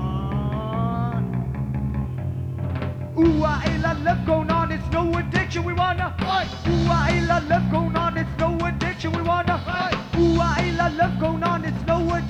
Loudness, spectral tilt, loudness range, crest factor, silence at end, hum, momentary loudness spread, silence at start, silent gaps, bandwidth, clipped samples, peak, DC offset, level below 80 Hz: -23 LUFS; -7 dB/octave; 2 LU; 16 dB; 0 s; none; 7 LU; 0 s; none; 8.8 kHz; under 0.1%; -6 dBFS; under 0.1%; -34 dBFS